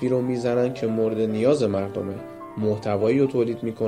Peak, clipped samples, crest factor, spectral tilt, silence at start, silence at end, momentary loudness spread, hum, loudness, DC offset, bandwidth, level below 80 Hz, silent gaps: -8 dBFS; under 0.1%; 16 dB; -7.5 dB/octave; 0 s; 0 s; 10 LU; none; -23 LUFS; under 0.1%; 11 kHz; -60 dBFS; none